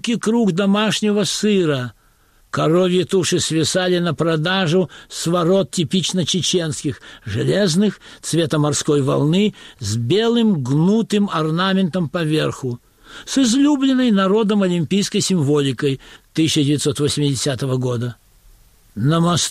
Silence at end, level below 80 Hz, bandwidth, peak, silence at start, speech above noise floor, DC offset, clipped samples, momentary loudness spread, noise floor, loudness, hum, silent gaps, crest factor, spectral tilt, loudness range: 0 s; -52 dBFS; 15 kHz; -6 dBFS; 0.05 s; 37 dB; under 0.1%; under 0.1%; 9 LU; -54 dBFS; -18 LUFS; none; none; 12 dB; -5 dB/octave; 2 LU